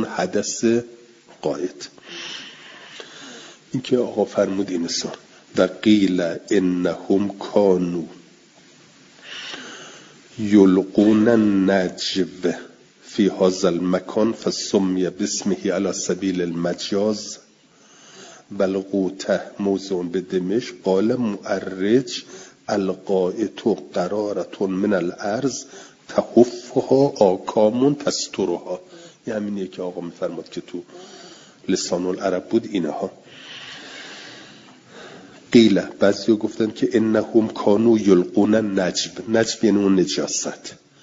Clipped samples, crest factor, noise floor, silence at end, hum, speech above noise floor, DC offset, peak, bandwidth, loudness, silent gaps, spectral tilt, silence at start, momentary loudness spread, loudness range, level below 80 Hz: under 0.1%; 20 dB; -53 dBFS; 0.3 s; none; 33 dB; under 0.1%; 0 dBFS; 7.8 kHz; -21 LUFS; none; -5 dB/octave; 0 s; 20 LU; 8 LU; -62 dBFS